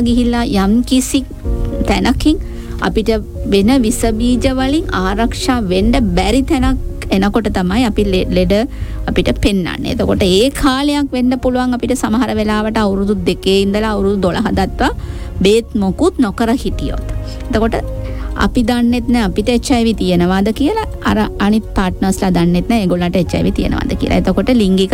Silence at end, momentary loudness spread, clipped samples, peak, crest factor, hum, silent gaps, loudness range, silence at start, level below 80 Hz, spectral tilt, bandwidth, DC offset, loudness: 0 s; 6 LU; under 0.1%; 0 dBFS; 14 dB; none; none; 2 LU; 0 s; -24 dBFS; -6 dB/octave; 16.5 kHz; under 0.1%; -14 LUFS